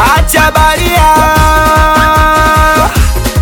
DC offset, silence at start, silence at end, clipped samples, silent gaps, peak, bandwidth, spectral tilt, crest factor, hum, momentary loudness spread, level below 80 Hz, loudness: under 0.1%; 0 s; 0 s; 0.4%; none; 0 dBFS; 19 kHz; -4 dB/octave; 6 dB; none; 2 LU; -14 dBFS; -7 LUFS